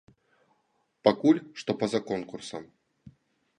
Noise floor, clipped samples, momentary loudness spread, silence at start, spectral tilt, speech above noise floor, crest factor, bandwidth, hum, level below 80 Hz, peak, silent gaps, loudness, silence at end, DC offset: -74 dBFS; under 0.1%; 16 LU; 1.05 s; -6 dB/octave; 46 dB; 24 dB; 10.5 kHz; none; -70 dBFS; -6 dBFS; none; -28 LUFS; 0.95 s; under 0.1%